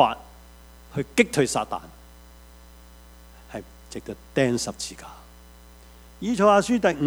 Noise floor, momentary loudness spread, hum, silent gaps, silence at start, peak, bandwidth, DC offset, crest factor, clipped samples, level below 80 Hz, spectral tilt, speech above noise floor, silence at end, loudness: -48 dBFS; 21 LU; none; none; 0 s; -2 dBFS; over 20 kHz; under 0.1%; 24 dB; under 0.1%; -50 dBFS; -4.5 dB/octave; 25 dB; 0 s; -23 LUFS